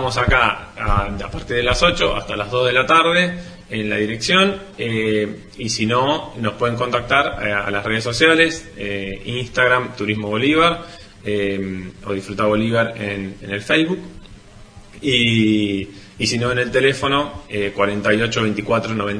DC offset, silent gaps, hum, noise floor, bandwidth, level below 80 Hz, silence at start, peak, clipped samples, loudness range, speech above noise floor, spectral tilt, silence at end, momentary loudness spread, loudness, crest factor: under 0.1%; none; none; -41 dBFS; 10.5 kHz; -36 dBFS; 0 s; 0 dBFS; under 0.1%; 3 LU; 23 dB; -4.5 dB/octave; 0 s; 12 LU; -18 LUFS; 18 dB